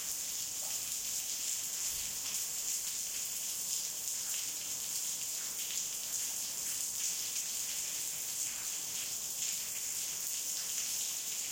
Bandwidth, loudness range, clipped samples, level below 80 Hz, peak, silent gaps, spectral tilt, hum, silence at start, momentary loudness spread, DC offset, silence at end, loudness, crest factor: 16.5 kHz; 0 LU; under 0.1%; -72 dBFS; -16 dBFS; none; 2 dB/octave; none; 0 s; 2 LU; under 0.1%; 0 s; -35 LUFS; 22 dB